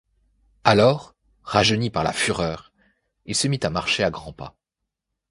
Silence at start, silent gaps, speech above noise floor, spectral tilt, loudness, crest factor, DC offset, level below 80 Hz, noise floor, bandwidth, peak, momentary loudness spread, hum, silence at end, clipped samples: 0.65 s; none; 62 dB; -4 dB/octave; -21 LUFS; 24 dB; under 0.1%; -48 dBFS; -83 dBFS; 11.5 kHz; 0 dBFS; 19 LU; none; 0.8 s; under 0.1%